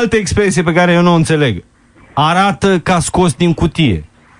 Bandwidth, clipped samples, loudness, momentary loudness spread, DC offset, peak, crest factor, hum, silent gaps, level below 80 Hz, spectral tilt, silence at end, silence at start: 11 kHz; under 0.1%; -12 LUFS; 5 LU; under 0.1%; 0 dBFS; 12 dB; none; none; -34 dBFS; -5.5 dB/octave; 0.35 s; 0 s